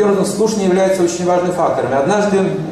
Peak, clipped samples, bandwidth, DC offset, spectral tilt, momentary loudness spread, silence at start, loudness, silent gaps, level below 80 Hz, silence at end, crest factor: -4 dBFS; under 0.1%; 14 kHz; under 0.1%; -5.5 dB/octave; 2 LU; 0 s; -15 LUFS; none; -50 dBFS; 0 s; 12 dB